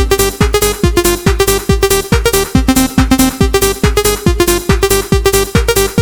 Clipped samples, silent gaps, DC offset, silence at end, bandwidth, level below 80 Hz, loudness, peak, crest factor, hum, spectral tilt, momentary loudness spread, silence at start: 0.2%; none; 0.3%; 0 s; over 20 kHz; -18 dBFS; -11 LUFS; 0 dBFS; 10 dB; none; -4.5 dB/octave; 1 LU; 0 s